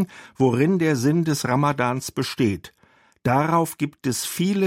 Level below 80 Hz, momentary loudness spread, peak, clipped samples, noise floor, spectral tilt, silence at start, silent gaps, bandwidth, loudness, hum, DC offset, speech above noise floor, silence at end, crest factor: -60 dBFS; 7 LU; -6 dBFS; under 0.1%; -41 dBFS; -5.5 dB/octave; 0 s; none; 16 kHz; -22 LUFS; none; under 0.1%; 20 dB; 0 s; 16 dB